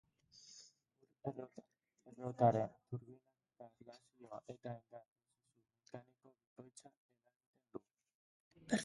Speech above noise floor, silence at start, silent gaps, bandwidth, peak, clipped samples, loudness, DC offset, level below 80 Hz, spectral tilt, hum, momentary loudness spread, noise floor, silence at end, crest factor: 40 dB; 0.45 s; 5.08-5.16 s, 6.47-6.56 s, 6.97-7.09 s, 7.36-7.40 s, 7.46-7.54 s, 8.15-8.51 s; 11 kHz; -20 dBFS; under 0.1%; -42 LUFS; under 0.1%; -80 dBFS; -6 dB/octave; none; 27 LU; -83 dBFS; 0 s; 26 dB